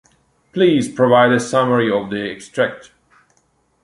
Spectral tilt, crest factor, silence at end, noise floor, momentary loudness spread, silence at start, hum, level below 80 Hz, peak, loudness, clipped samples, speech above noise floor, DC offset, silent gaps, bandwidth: -5.5 dB/octave; 16 dB; 1.05 s; -62 dBFS; 12 LU; 0.55 s; none; -58 dBFS; -2 dBFS; -16 LUFS; under 0.1%; 46 dB; under 0.1%; none; 11.5 kHz